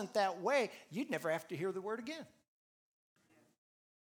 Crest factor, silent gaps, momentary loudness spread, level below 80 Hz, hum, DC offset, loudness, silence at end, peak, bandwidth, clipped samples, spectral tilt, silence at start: 22 dB; none; 12 LU; under -90 dBFS; none; under 0.1%; -38 LUFS; 1.9 s; -20 dBFS; over 20 kHz; under 0.1%; -4.5 dB/octave; 0 s